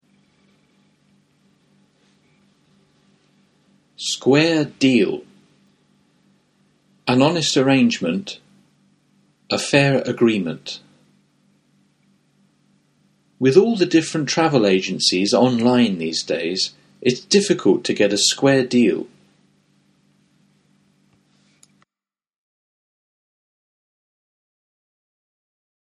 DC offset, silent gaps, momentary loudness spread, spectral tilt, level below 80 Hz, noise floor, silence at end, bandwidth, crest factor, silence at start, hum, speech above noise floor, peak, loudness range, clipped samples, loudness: under 0.1%; none; 12 LU; -4.5 dB/octave; -64 dBFS; under -90 dBFS; 6.85 s; 12 kHz; 22 dB; 4 s; none; over 73 dB; 0 dBFS; 6 LU; under 0.1%; -18 LUFS